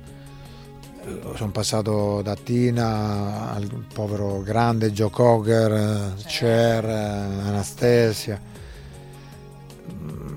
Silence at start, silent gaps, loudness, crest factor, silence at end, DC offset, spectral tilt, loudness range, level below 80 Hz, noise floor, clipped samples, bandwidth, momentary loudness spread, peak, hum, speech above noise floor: 0 s; none; -22 LUFS; 20 dB; 0 s; under 0.1%; -6 dB/octave; 4 LU; -48 dBFS; -42 dBFS; under 0.1%; 16.5 kHz; 23 LU; -2 dBFS; none; 20 dB